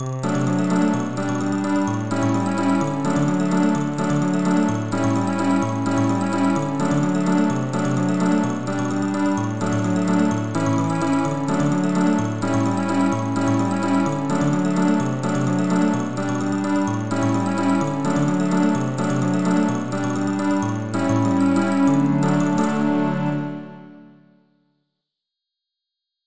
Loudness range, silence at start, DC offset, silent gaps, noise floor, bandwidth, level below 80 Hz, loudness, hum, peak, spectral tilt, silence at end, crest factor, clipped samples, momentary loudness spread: 1 LU; 0 s; 1%; none; -83 dBFS; 8 kHz; -54 dBFS; -21 LUFS; none; -6 dBFS; -7 dB/octave; 0 s; 14 dB; under 0.1%; 4 LU